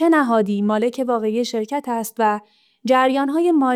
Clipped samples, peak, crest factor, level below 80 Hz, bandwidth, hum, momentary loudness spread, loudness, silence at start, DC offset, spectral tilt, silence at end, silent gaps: under 0.1%; -6 dBFS; 14 dB; -72 dBFS; 16 kHz; none; 8 LU; -19 LUFS; 0 s; under 0.1%; -5.5 dB/octave; 0 s; none